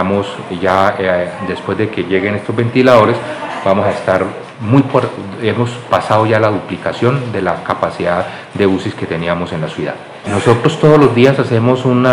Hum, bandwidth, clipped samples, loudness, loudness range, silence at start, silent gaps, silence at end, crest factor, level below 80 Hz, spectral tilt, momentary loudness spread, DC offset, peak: none; 11.5 kHz; 0.8%; -14 LUFS; 4 LU; 0 s; none; 0 s; 14 dB; -52 dBFS; -7 dB/octave; 11 LU; under 0.1%; 0 dBFS